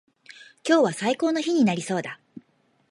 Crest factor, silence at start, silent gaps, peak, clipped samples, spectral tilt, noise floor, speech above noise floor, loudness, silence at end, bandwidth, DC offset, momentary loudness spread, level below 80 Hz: 18 dB; 0.4 s; none; -8 dBFS; under 0.1%; -5 dB/octave; -65 dBFS; 43 dB; -23 LUFS; 0.5 s; 11.5 kHz; under 0.1%; 14 LU; -74 dBFS